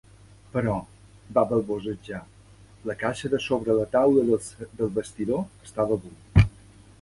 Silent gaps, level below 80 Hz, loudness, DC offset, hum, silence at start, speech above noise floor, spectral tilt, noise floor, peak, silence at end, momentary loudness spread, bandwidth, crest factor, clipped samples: none; -40 dBFS; -26 LUFS; under 0.1%; none; 0.55 s; 26 dB; -7 dB/octave; -51 dBFS; -4 dBFS; 0.55 s; 14 LU; 11.5 kHz; 22 dB; under 0.1%